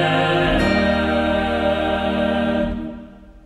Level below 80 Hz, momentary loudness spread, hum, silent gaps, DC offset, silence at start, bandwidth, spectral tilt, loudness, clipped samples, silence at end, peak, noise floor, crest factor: -32 dBFS; 8 LU; none; none; under 0.1%; 0 s; 13.5 kHz; -6.5 dB/octave; -19 LUFS; under 0.1%; 0.05 s; -6 dBFS; -39 dBFS; 14 dB